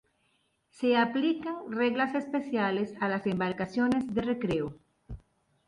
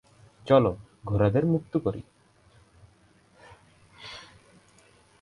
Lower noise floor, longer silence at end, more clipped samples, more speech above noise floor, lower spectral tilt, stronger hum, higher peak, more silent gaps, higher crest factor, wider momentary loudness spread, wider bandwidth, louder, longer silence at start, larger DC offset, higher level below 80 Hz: first, -73 dBFS vs -60 dBFS; second, 0.5 s vs 1 s; neither; first, 44 dB vs 37 dB; second, -7 dB/octave vs -8.5 dB/octave; neither; second, -14 dBFS vs -6 dBFS; neither; second, 16 dB vs 22 dB; second, 11 LU vs 22 LU; about the same, 11 kHz vs 11 kHz; second, -30 LUFS vs -25 LUFS; first, 0.75 s vs 0.45 s; neither; second, -58 dBFS vs -52 dBFS